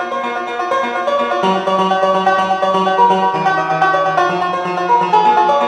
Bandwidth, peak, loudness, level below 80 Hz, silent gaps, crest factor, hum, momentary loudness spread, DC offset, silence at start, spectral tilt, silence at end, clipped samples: 11 kHz; 0 dBFS; -14 LUFS; -62 dBFS; none; 14 dB; none; 6 LU; under 0.1%; 0 s; -5 dB/octave; 0 s; under 0.1%